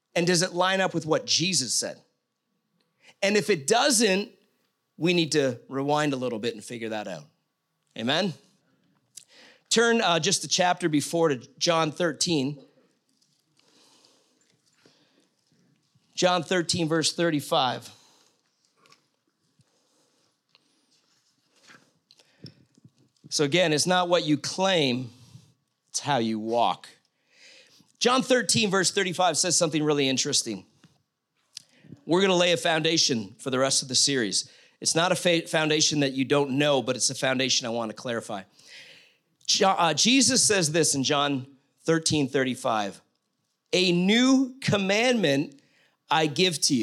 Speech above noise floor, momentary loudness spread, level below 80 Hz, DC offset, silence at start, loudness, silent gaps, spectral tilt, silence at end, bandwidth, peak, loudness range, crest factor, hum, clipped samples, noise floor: 53 dB; 12 LU; -74 dBFS; under 0.1%; 0.15 s; -24 LUFS; none; -3 dB/octave; 0 s; 15 kHz; -8 dBFS; 7 LU; 18 dB; none; under 0.1%; -78 dBFS